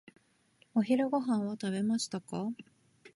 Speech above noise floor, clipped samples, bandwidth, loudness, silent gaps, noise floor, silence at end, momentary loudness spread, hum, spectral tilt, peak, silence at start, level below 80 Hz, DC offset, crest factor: 37 dB; under 0.1%; 11.5 kHz; -33 LUFS; none; -68 dBFS; 0.05 s; 9 LU; none; -5.5 dB/octave; -18 dBFS; 0.75 s; -78 dBFS; under 0.1%; 16 dB